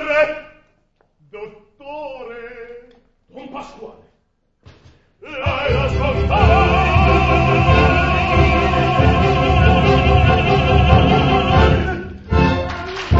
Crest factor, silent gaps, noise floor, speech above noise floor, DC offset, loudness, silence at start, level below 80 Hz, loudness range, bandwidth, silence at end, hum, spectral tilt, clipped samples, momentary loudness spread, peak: 16 dB; none; -64 dBFS; 45 dB; under 0.1%; -15 LUFS; 0 s; -22 dBFS; 21 LU; 7.6 kHz; 0 s; none; -7 dB/octave; under 0.1%; 20 LU; 0 dBFS